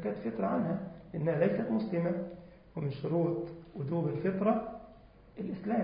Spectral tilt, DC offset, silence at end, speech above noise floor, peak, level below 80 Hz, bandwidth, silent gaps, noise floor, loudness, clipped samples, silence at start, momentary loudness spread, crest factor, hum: -8.5 dB/octave; under 0.1%; 0 s; 23 dB; -16 dBFS; -62 dBFS; 5 kHz; none; -56 dBFS; -34 LUFS; under 0.1%; 0 s; 14 LU; 18 dB; none